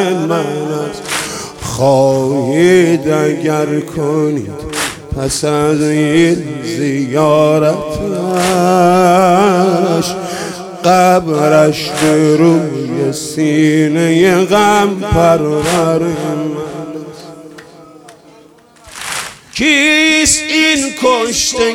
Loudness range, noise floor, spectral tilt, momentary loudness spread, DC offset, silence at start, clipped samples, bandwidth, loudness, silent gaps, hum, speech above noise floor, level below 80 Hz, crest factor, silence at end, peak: 5 LU; -42 dBFS; -4.5 dB/octave; 12 LU; under 0.1%; 0 s; under 0.1%; 16.5 kHz; -12 LUFS; none; none; 31 dB; -40 dBFS; 12 dB; 0 s; 0 dBFS